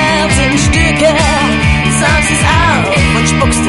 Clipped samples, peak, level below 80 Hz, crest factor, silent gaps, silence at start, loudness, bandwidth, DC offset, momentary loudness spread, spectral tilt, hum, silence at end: under 0.1%; 0 dBFS; -18 dBFS; 10 dB; none; 0 s; -9 LUFS; 11.5 kHz; 0.5%; 1 LU; -4 dB/octave; none; 0 s